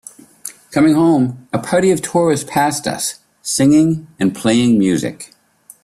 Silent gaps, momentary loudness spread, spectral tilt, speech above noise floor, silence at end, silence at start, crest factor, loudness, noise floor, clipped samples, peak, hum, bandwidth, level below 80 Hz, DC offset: none; 16 LU; -5 dB/octave; 21 dB; 0.6 s; 0.45 s; 14 dB; -15 LUFS; -36 dBFS; under 0.1%; -2 dBFS; none; 14.5 kHz; -52 dBFS; under 0.1%